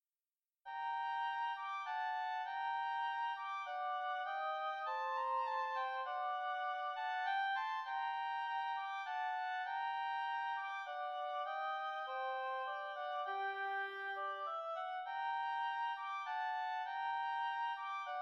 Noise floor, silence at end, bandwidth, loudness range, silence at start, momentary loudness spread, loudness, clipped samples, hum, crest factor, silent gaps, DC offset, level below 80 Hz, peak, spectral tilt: under -90 dBFS; 0 s; 7.4 kHz; 2 LU; 0.65 s; 4 LU; -41 LUFS; under 0.1%; none; 12 dB; none; under 0.1%; under -90 dBFS; -28 dBFS; 0 dB/octave